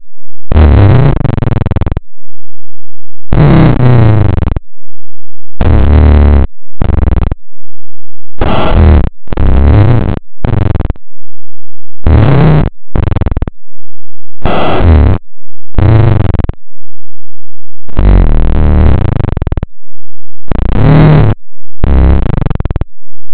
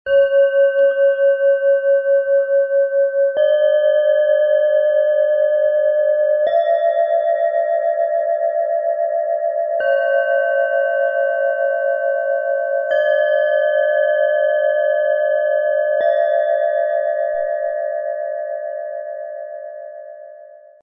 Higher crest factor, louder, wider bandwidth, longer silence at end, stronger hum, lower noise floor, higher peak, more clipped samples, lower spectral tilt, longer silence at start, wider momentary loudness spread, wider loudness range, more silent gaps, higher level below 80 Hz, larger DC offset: second, 2 dB vs 10 dB; first, -9 LUFS vs -17 LUFS; about the same, 4 kHz vs 3.7 kHz; second, 0 s vs 0.25 s; neither; first, under -90 dBFS vs -41 dBFS; first, 0 dBFS vs -6 dBFS; first, 40% vs under 0.1%; first, -11.5 dB/octave vs -4 dB/octave; about the same, 0 s vs 0.05 s; first, 13 LU vs 9 LU; about the same, 3 LU vs 4 LU; neither; first, -12 dBFS vs -68 dBFS; neither